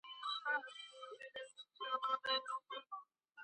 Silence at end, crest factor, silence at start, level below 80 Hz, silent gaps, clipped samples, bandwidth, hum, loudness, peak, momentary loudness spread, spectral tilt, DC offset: 0 s; 18 dB; 0.05 s; under -90 dBFS; none; under 0.1%; 9 kHz; none; -43 LUFS; -26 dBFS; 14 LU; 0.5 dB/octave; under 0.1%